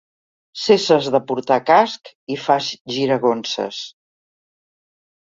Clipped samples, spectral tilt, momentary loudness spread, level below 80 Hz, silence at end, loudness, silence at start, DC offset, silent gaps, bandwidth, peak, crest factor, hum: under 0.1%; -4.5 dB/octave; 15 LU; -66 dBFS; 1.35 s; -18 LUFS; 0.55 s; under 0.1%; 2.15-2.27 s, 2.81-2.85 s; 7.8 kHz; -2 dBFS; 18 dB; none